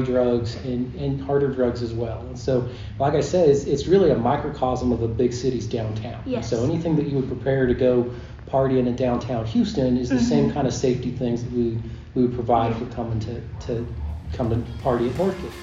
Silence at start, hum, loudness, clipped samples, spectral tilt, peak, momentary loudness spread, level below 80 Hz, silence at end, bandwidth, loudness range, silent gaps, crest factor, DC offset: 0 s; none; -23 LUFS; under 0.1%; -7 dB/octave; -4 dBFS; 10 LU; -40 dBFS; 0 s; 7.6 kHz; 4 LU; none; 18 dB; under 0.1%